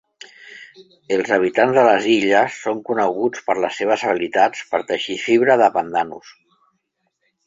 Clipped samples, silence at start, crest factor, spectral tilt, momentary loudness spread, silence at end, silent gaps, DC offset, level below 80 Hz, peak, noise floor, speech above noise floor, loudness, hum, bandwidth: under 0.1%; 0.45 s; 18 dB; -4.5 dB/octave; 10 LU; 1.15 s; none; under 0.1%; -64 dBFS; -2 dBFS; -71 dBFS; 53 dB; -18 LUFS; none; 7.8 kHz